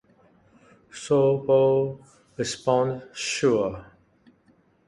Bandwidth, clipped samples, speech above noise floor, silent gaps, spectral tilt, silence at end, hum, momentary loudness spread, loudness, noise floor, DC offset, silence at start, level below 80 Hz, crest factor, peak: 11.5 kHz; under 0.1%; 39 dB; none; -5 dB/octave; 1.05 s; none; 22 LU; -24 LUFS; -62 dBFS; under 0.1%; 0.95 s; -60 dBFS; 16 dB; -10 dBFS